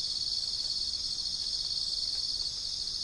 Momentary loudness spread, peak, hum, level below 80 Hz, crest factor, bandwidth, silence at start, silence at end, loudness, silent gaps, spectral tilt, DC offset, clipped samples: 2 LU; -20 dBFS; none; -54 dBFS; 14 dB; 10.5 kHz; 0 s; 0 s; -30 LUFS; none; 0.5 dB/octave; under 0.1%; under 0.1%